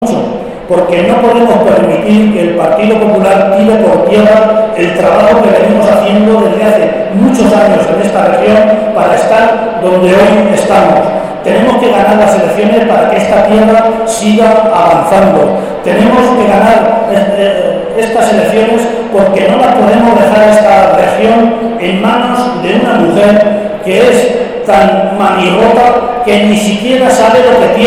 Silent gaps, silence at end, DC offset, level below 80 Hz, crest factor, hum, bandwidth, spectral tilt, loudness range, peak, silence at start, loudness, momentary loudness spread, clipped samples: none; 0 s; 0.4%; -36 dBFS; 6 dB; none; 15.5 kHz; -5.5 dB/octave; 2 LU; 0 dBFS; 0 s; -7 LUFS; 5 LU; 2%